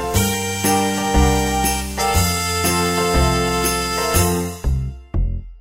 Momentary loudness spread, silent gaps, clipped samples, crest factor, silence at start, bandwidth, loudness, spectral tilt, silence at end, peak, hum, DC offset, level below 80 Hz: 7 LU; none; under 0.1%; 16 dB; 0 s; 16.5 kHz; -18 LUFS; -4 dB/octave; 0.05 s; -2 dBFS; none; 0.4%; -26 dBFS